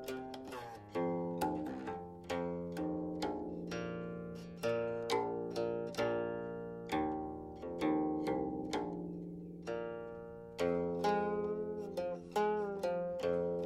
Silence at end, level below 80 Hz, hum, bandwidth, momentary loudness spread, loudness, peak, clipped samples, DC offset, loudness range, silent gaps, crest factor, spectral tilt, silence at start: 0 s; -66 dBFS; none; 15.5 kHz; 11 LU; -39 LUFS; -22 dBFS; under 0.1%; under 0.1%; 3 LU; none; 16 dB; -6.5 dB/octave; 0 s